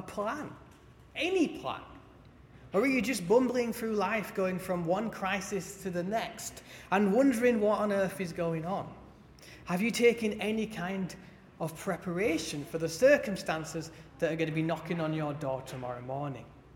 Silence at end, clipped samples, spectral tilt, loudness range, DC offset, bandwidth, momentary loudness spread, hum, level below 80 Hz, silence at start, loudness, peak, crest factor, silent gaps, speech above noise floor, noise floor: 0.05 s; under 0.1%; -5.5 dB/octave; 3 LU; under 0.1%; 17.5 kHz; 14 LU; none; -60 dBFS; 0 s; -31 LUFS; -12 dBFS; 20 dB; none; 24 dB; -55 dBFS